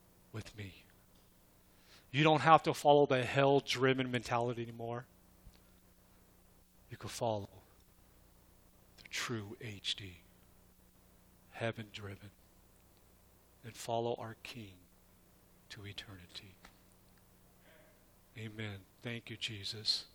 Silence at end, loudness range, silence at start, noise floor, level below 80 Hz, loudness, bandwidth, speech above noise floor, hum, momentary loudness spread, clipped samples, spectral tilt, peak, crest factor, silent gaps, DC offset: 0.1 s; 20 LU; 0.35 s; -66 dBFS; -68 dBFS; -35 LUFS; over 20 kHz; 30 dB; 60 Hz at -65 dBFS; 23 LU; under 0.1%; -5 dB/octave; -10 dBFS; 28 dB; none; under 0.1%